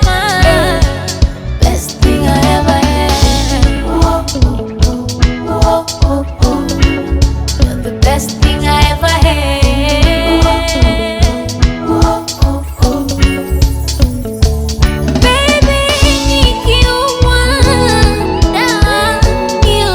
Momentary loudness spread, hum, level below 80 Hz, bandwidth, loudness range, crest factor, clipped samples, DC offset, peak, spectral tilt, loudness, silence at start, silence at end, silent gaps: 5 LU; none; -14 dBFS; 19 kHz; 3 LU; 10 dB; 0.2%; under 0.1%; 0 dBFS; -5 dB/octave; -11 LUFS; 0 s; 0 s; none